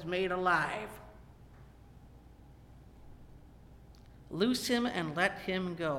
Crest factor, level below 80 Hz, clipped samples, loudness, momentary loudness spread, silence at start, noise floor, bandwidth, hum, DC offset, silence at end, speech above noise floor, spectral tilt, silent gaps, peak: 22 dB; -58 dBFS; under 0.1%; -32 LUFS; 16 LU; 0 s; -56 dBFS; 16.5 kHz; none; under 0.1%; 0 s; 23 dB; -4.5 dB/octave; none; -14 dBFS